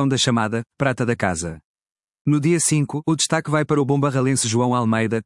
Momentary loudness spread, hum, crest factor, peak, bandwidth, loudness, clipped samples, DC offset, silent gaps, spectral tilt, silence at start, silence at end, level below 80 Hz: 5 LU; none; 18 dB; -4 dBFS; 12 kHz; -20 LUFS; under 0.1%; under 0.1%; 1.64-1.75 s, 1.92-1.96 s, 2.21-2.25 s; -4.5 dB/octave; 0 s; 0.05 s; -56 dBFS